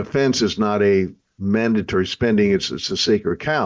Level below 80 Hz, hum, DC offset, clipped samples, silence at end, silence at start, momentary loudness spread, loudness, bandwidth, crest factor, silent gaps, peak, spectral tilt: -44 dBFS; none; under 0.1%; under 0.1%; 0 s; 0 s; 5 LU; -19 LUFS; 7.6 kHz; 12 dB; none; -6 dBFS; -5 dB/octave